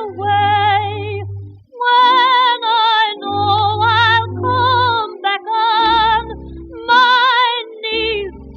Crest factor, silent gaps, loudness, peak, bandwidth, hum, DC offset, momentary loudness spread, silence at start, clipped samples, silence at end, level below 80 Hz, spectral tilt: 14 dB; none; -14 LUFS; 0 dBFS; 7 kHz; none; under 0.1%; 13 LU; 0 s; under 0.1%; 0 s; -42 dBFS; -5 dB/octave